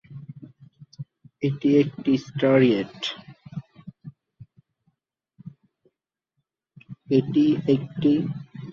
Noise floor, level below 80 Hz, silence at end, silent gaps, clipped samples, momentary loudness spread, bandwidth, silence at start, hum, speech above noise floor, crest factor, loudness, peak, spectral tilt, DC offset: -81 dBFS; -64 dBFS; 0 s; none; under 0.1%; 23 LU; 7 kHz; 0.1 s; none; 60 dB; 20 dB; -22 LUFS; -6 dBFS; -7.5 dB/octave; under 0.1%